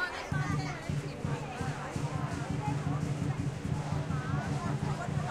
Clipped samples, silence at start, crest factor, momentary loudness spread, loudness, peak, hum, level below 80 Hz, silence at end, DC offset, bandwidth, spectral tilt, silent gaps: under 0.1%; 0 s; 14 dB; 3 LU; -35 LUFS; -20 dBFS; none; -50 dBFS; 0 s; under 0.1%; 12 kHz; -6.5 dB/octave; none